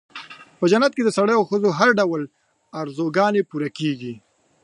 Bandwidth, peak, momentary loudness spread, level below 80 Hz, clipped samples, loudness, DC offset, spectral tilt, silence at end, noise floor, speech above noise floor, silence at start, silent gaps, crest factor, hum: 11 kHz; -2 dBFS; 20 LU; -72 dBFS; under 0.1%; -20 LUFS; under 0.1%; -5.5 dB/octave; 0.45 s; -40 dBFS; 21 dB; 0.15 s; none; 20 dB; none